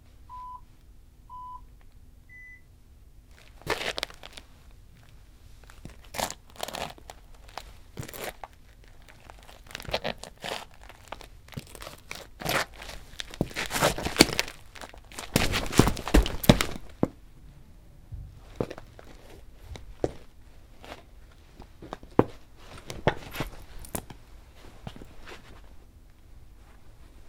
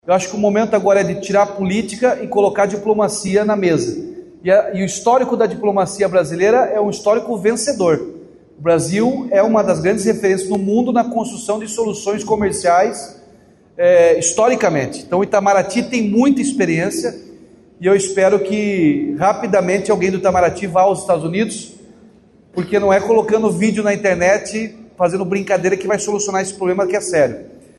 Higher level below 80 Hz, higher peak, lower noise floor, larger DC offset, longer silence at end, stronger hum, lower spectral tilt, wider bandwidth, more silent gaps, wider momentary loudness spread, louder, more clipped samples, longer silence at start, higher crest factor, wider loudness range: first, -40 dBFS vs -52 dBFS; about the same, 0 dBFS vs -2 dBFS; first, -52 dBFS vs -47 dBFS; neither; second, 0 s vs 0.3 s; neither; about the same, -4 dB/octave vs -5 dB/octave; first, 18 kHz vs 12.5 kHz; neither; first, 26 LU vs 7 LU; second, -29 LUFS vs -16 LUFS; neither; first, 0.2 s vs 0.05 s; first, 32 dB vs 12 dB; first, 16 LU vs 2 LU